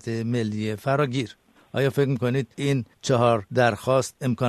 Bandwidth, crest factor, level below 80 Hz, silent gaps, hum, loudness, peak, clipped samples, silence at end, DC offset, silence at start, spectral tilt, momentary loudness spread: 13.5 kHz; 18 dB; -60 dBFS; none; none; -24 LUFS; -6 dBFS; under 0.1%; 0 s; under 0.1%; 0.05 s; -6 dB/octave; 7 LU